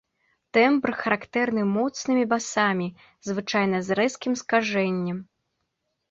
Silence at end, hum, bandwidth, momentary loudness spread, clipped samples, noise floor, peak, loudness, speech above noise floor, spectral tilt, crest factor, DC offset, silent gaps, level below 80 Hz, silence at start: 0.9 s; none; 8 kHz; 10 LU; under 0.1%; -78 dBFS; -6 dBFS; -24 LUFS; 54 dB; -5 dB/octave; 20 dB; under 0.1%; none; -66 dBFS; 0.55 s